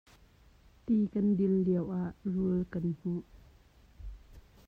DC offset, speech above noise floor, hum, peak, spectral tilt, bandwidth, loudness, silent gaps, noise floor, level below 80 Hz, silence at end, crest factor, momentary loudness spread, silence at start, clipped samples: under 0.1%; 30 dB; none; -20 dBFS; -11 dB/octave; 4.5 kHz; -32 LUFS; none; -61 dBFS; -54 dBFS; 0.3 s; 14 dB; 22 LU; 0.85 s; under 0.1%